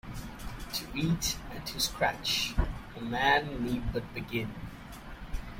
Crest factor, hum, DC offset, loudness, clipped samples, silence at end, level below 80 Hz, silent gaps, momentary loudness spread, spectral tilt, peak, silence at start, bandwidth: 20 dB; none; under 0.1%; -31 LUFS; under 0.1%; 0 s; -42 dBFS; none; 16 LU; -3.5 dB/octave; -12 dBFS; 0.05 s; 16.5 kHz